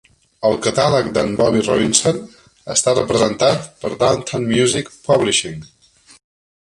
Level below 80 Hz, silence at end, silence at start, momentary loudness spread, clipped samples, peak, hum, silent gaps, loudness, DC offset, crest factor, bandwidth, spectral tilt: -48 dBFS; 0.95 s; 0.4 s; 8 LU; under 0.1%; 0 dBFS; none; none; -17 LUFS; under 0.1%; 18 dB; 11.5 kHz; -3.5 dB/octave